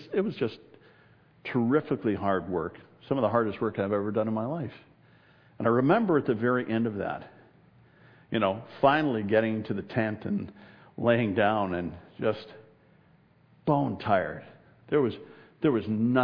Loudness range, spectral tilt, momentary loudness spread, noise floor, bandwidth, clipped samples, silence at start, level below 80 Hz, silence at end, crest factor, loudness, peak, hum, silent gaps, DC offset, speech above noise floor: 3 LU; -10 dB/octave; 12 LU; -61 dBFS; 5.4 kHz; under 0.1%; 0 s; -64 dBFS; 0 s; 20 dB; -28 LUFS; -8 dBFS; none; none; under 0.1%; 34 dB